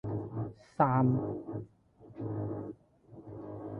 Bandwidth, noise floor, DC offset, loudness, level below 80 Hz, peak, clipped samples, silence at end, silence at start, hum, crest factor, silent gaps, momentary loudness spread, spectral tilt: 5.2 kHz; -55 dBFS; under 0.1%; -34 LUFS; -60 dBFS; -10 dBFS; under 0.1%; 0 s; 0.05 s; none; 24 dB; none; 25 LU; -11 dB/octave